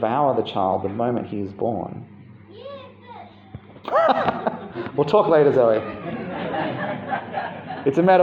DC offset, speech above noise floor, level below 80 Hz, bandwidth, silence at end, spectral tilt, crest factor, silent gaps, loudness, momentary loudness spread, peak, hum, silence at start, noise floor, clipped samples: under 0.1%; 23 dB; -62 dBFS; 7.4 kHz; 0 s; -8 dB/octave; 20 dB; none; -22 LUFS; 24 LU; -2 dBFS; none; 0 s; -43 dBFS; under 0.1%